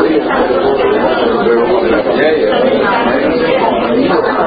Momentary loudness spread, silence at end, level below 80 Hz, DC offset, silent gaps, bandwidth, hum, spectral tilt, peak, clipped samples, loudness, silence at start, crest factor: 1 LU; 0 s; -40 dBFS; under 0.1%; none; 5 kHz; none; -9.5 dB/octave; 0 dBFS; under 0.1%; -11 LUFS; 0 s; 10 dB